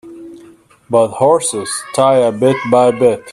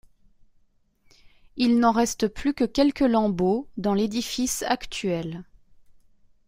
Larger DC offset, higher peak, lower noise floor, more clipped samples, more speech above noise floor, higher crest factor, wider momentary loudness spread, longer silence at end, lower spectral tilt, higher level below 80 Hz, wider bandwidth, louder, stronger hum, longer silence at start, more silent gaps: neither; first, 0 dBFS vs -8 dBFS; second, -43 dBFS vs -62 dBFS; neither; second, 31 dB vs 39 dB; about the same, 14 dB vs 18 dB; about the same, 7 LU vs 8 LU; second, 0 s vs 1.05 s; about the same, -4.5 dB/octave vs -4.5 dB/octave; second, -56 dBFS vs -50 dBFS; second, 12.5 kHz vs 16 kHz; first, -13 LUFS vs -24 LUFS; neither; second, 0.05 s vs 1.55 s; neither